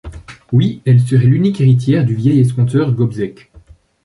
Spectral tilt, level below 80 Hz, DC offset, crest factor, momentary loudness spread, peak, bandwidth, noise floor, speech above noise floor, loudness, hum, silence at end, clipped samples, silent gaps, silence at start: -9 dB/octave; -42 dBFS; under 0.1%; 12 dB; 7 LU; -2 dBFS; 11.5 kHz; -44 dBFS; 32 dB; -13 LUFS; none; 0.45 s; under 0.1%; none; 0.05 s